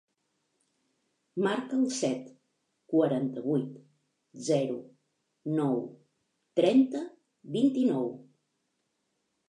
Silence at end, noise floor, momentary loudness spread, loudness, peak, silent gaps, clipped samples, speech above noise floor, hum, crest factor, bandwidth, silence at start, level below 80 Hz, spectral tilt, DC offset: 1.25 s; -79 dBFS; 15 LU; -29 LUFS; -10 dBFS; none; under 0.1%; 51 dB; none; 20 dB; 11 kHz; 1.35 s; -86 dBFS; -6 dB/octave; under 0.1%